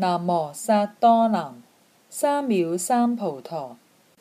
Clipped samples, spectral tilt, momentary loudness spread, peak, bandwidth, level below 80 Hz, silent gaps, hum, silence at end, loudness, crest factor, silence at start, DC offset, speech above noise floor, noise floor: under 0.1%; -5.5 dB/octave; 15 LU; -6 dBFS; 15.5 kHz; -78 dBFS; none; none; 0.45 s; -22 LUFS; 16 dB; 0 s; under 0.1%; 32 dB; -54 dBFS